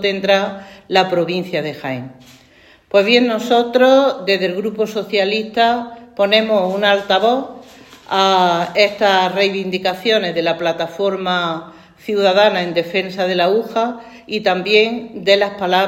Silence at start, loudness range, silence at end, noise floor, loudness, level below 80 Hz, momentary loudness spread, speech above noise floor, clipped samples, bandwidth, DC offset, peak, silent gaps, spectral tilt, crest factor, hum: 0 s; 2 LU; 0 s; -48 dBFS; -16 LUFS; -60 dBFS; 10 LU; 32 dB; under 0.1%; 16.5 kHz; under 0.1%; 0 dBFS; none; -4.5 dB/octave; 16 dB; none